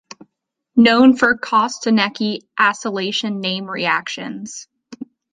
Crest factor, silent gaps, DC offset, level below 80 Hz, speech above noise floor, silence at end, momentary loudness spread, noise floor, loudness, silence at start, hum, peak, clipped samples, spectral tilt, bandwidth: 18 dB; none; under 0.1%; -62 dBFS; 57 dB; 0.3 s; 20 LU; -74 dBFS; -17 LUFS; 0.75 s; none; -2 dBFS; under 0.1%; -4 dB/octave; 9.6 kHz